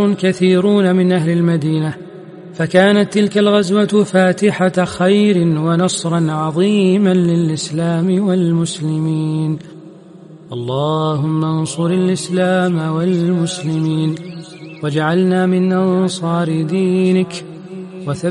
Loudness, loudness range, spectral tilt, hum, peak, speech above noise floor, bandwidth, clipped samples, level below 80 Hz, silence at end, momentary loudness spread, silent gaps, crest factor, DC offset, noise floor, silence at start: -15 LUFS; 5 LU; -6.5 dB/octave; none; 0 dBFS; 24 dB; 11.5 kHz; under 0.1%; -58 dBFS; 0 s; 12 LU; none; 14 dB; under 0.1%; -38 dBFS; 0 s